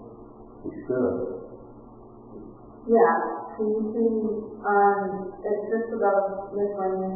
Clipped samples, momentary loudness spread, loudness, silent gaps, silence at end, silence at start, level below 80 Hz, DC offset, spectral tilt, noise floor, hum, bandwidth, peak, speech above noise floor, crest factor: under 0.1%; 23 LU; -25 LUFS; none; 0 s; 0 s; -58 dBFS; under 0.1%; -14 dB/octave; -46 dBFS; none; 2.1 kHz; -6 dBFS; 22 dB; 20 dB